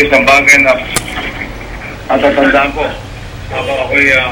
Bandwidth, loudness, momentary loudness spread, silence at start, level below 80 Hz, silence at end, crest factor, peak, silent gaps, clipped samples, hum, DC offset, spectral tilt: over 20 kHz; -9 LUFS; 19 LU; 0 s; -30 dBFS; 0 s; 12 dB; 0 dBFS; none; 0.5%; none; under 0.1%; -3.5 dB/octave